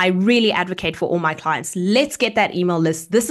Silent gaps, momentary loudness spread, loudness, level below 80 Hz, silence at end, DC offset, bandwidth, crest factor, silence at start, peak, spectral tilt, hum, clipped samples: none; 7 LU; -19 LUFS; -54 dBFS; 0 s; under 0.1%; 12.5 kHz; 16 dB; 0 s; -4 dBFS; -4.5 dB/octave; none; under 0.1%